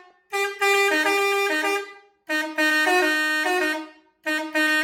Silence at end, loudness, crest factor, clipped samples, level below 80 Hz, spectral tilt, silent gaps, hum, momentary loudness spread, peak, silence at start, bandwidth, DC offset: 0 s; -21 LUFS; 16 dB; under 0.1%; -72 dBFS; 0 dB/octave; none; none; 10 LU; -8 dBFS; 0.3 s; 17.5 kHz; under 0.1%